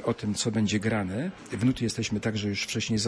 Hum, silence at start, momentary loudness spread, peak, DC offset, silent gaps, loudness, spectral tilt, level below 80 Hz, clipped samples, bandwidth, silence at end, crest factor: none; 0 s; 4 LU; -14 dBFS; under 0.1%; none; -28 LUFS; -4.5 dB/octave; -54 dBFS; under 0.1%; 11 kHz; 0 s; 14 dB